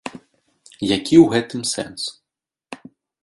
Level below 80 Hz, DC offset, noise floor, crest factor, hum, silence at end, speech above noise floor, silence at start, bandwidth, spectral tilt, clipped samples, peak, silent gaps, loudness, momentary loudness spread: -54 dBFS; under 0.1%; -85 dBFS; 20 dB; none; 0.5 s; 68 dB; 0.05 s; 11.5 kHz; -4.5 dB/octave; under 0.1%; 0 dBFS; none; -18 LUFS; 25 LU